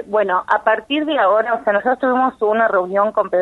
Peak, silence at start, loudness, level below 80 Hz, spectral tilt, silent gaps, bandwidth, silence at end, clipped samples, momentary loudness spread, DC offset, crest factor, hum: -2 dBFS; 0 s; -17 LUFS; -60 dBFS; -6 dB/octave; none; 5 kHz; 0 s; under 0.1%; 2 LU; under 0.1%; 16 dB; none